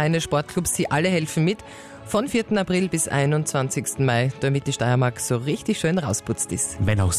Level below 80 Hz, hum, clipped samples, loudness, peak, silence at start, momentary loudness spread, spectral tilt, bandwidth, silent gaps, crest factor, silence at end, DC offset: -46 dBFS; none; under 0.1%; -23 LUFS; -10 dBFS; 0 s; 4 LU; -5 dB/octave; 14 kHz; none; 12 dB; 0 s; under 0.1%